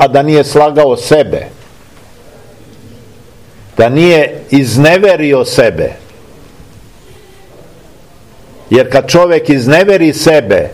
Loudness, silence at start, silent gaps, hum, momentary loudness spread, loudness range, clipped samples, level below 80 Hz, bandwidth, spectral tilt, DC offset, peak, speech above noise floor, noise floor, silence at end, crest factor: -8 LUFS; 0 s; none; none; 6 LU; 7 LU; 3%; -40 dBFS; 16 kHz; -5.5 dB/octave; 0.9%; 0 dBFS; 31 dB; -39 dBFS; 0 s; 10 dB